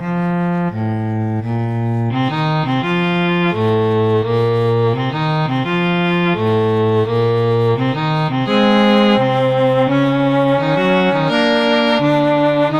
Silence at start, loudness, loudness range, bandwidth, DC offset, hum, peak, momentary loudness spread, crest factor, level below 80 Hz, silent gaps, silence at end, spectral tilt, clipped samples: 0 s; -15 LUFS; 3 LU; 9.2 kHz; under 0.1%; none; -2 dBFS; 5 LU; 14 dB; -48 dBFS; none; 0 s; -7.5 dB/octave; under 0.1%